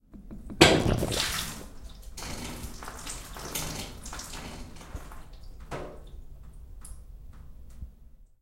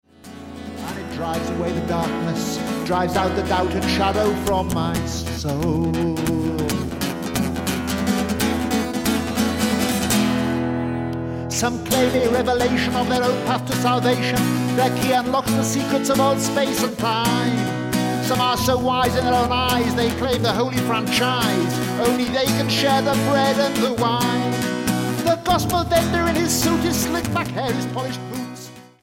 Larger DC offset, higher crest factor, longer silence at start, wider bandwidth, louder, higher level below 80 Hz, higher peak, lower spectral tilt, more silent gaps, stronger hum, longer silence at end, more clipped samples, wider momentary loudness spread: neither; first, 32 dB vs 16 dB; second, 0.1 s vs 0.25 s; about the same, 16.5 kHz vs 17 kHz; second, -29 LUFS vs -20 LUFS; about the same, -42 dBFS vs -40 dBFS; first, 0 dBFS vs -4 dBFS; about the same, -3.5 dB/octave vs -4.5 dB/octave; neither; neither; about the same, 0.15 s vs 0.2 s; neither; first, 25 LU vs 6 LU